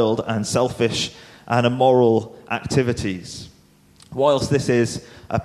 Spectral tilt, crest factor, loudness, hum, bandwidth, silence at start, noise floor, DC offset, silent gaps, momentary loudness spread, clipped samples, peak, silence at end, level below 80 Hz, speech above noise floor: -5.5 dB/octave; 18 dB; -20 LUFS; none; 13.5 kHz; 0 s; -53 dBFS; under 0.1%; none; 13 LU; under 0.1%; -4 dBFS; 0 s; -48 dBFS; 33 dB